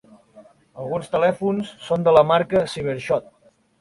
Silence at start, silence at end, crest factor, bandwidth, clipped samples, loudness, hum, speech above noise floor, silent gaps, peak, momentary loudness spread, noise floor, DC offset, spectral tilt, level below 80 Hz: 0.35 s; 0.6 s; 20 dB; 11.5 kHz; under 0.1%; -20 LUFS; none; 30 dB; none; -2 dBFS; 12 LU; -50 dBFS; under 0.1%; -6.5 dB/octave; -56 dBFS